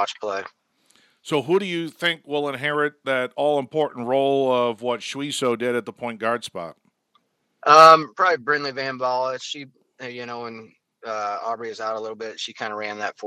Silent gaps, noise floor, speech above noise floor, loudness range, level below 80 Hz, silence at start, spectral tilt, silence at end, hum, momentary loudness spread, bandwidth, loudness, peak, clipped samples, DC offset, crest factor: none; -67 dBFS; 45 dB; 12 LU; -78 dBFS; 0 s; -4 dB/octave; 0 s; none; 15 LU; 15 kHz; -21 LUFS; 0 dBFS; under 0.1%; under 0.1%; 22 dB